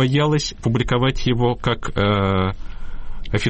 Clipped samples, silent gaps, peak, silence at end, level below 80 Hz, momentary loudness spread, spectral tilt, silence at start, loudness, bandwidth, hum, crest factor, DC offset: under 0.1%; none; -8 dBFS; 0 s; -30 dBFS; 19 LU; -6 dB/octave; 0 s; -20 LUFS; 8.6 kHz; none; 12 dB; under 0.1%